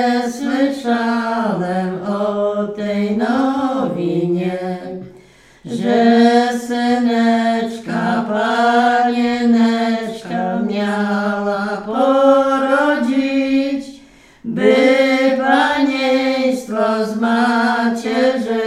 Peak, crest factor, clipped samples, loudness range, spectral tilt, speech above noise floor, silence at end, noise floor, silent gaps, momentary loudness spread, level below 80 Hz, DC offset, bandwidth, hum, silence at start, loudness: 0 dBFS; 16 dB; under 0.1%; 4 LU; -6 dB/octave; 28 dB; 0 s; -45 dBFS; none; 9 LU; -56 dBFS; under 0.1%; 12 kHz; none; 0 s; -16 LUFS